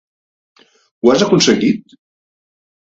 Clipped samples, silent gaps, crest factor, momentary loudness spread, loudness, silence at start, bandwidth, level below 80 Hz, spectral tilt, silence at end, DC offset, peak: under 0.1%; none; 18 dB; 6 LU; -13 LUFS; 1.05 s; 8 kHz; -56 dBFS; -4.5 dB/octave; 1.1 s; under 0.1%; 0 dBFS